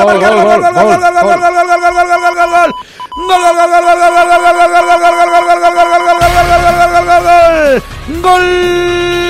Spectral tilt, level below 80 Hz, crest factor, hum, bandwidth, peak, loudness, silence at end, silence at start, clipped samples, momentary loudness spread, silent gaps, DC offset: -4 dB/octave; -28 dBFS; 8 dB; none; 15.5 kHz; 0 dBFS; -7 LUFS; 0 s; 0 s; 3%; 5 LU; none; under 0.1%